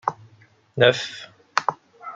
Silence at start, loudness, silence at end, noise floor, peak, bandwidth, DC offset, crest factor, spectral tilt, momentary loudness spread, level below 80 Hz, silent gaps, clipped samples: 0.05 s; -22 LUFS; 0 s; -55 dBFS; -2 dBFS; 7.8 kHz; under 0.1%; 24 dB; -4 dB/octave; 20 LU; -66 dBFS; none; under 0.1%